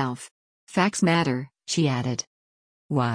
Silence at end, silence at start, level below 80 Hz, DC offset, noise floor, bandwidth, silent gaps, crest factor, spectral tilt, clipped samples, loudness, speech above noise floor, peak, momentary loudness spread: 0 s; 0 s; -64 dBFS; under 0.1%; under -90 dBFS; 10.5 kHz; 0.31-0.67 s, 2.27-2.89 s; 18 dB; -5 dB/octave; under 0.1%; -25 LUFS; over 66 dB; -8 dBFS; 15 LU